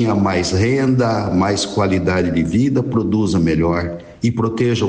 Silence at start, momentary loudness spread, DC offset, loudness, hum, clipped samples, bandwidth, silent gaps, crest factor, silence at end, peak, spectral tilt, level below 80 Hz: 0 s; 3 LU; under 0.1%; -17 LUFS; none; under 0.1%; 9.6 kHz; none; 12 dB; 0 s; -4 dBFS; -6.5 dB/octave; -38 dBFS